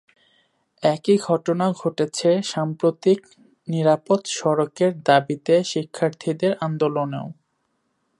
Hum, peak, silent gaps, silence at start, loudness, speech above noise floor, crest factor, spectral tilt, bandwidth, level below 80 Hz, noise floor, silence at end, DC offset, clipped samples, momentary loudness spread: none; -2 dBFS; none; 0.8 s; -21 LUFS; 51 dB; 20 dB; -5.5 dB/octave; 11.5 kHz; -72 dBFS; -71 dBFS; 0.85 s; under 0.1%; under 0.1%; 7 LU